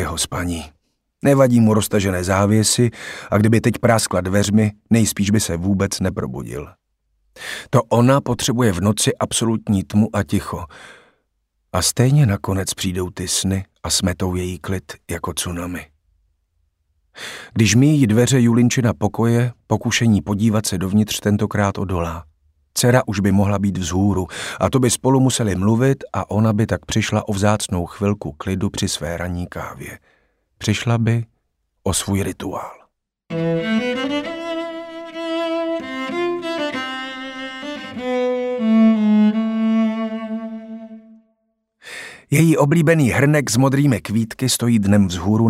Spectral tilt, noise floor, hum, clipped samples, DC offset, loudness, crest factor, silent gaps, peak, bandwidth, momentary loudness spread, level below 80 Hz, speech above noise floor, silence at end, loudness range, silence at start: -5.5 dB/octave; -70 dBFS; none; under 0.1%; under 0.1%; -18 LUFS; 18 dB; none; 0 dBFS; 16 kHz; 14 LU; -44 dBFS; 52 dB; 0 s; 7 LU; 0 s